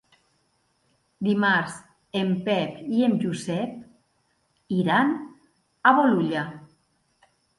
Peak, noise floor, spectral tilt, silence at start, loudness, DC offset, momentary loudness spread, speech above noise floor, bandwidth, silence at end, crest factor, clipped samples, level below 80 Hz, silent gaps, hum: -4 dBFS; -69 dBFS; -6 dB/octave; 1.2 s; -24 LUFS; under 0.1%; 14 LU; 47 dB; 11.5 kHz; 0.95 s; 22 dB; under 0.1%; -68 dBFS; none; none